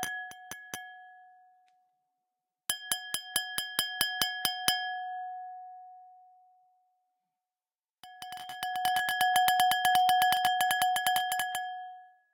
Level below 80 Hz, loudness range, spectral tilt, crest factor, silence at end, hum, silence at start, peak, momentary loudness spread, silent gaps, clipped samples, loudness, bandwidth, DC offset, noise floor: -74 dBFS; 17 LU; 0.5 dB/octave; 28 dB; 0.25 s; none; 0 s; -4 dBFS; 19 LU; none; under 0.1%; -29 LUFS; 18 kHz; under 0.1%; under -90 dBFS